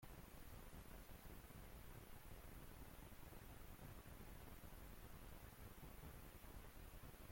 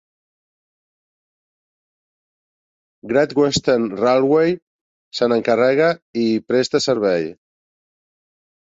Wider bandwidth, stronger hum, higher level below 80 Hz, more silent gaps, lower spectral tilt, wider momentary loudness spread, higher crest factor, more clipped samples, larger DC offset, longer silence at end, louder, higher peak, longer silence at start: first, 16.5 kHz vs 8 kHz; neither; about the same, -62 dBFS vs -58 dBFS; second, none vs 4.62-5.11 s, 6.02-6.14 s; about the same, -5 dB/octave vs -5 dB/octave; second, 1 LU vs 7 LU; second, 12 dB vs 18 dB; neither; neither; second, 0 s vs 1.4 s; second, -61 LUFS vs -18 LUFS; second, -46 dBFS vs -2 dBFS; second, 0 s vs 3.05 s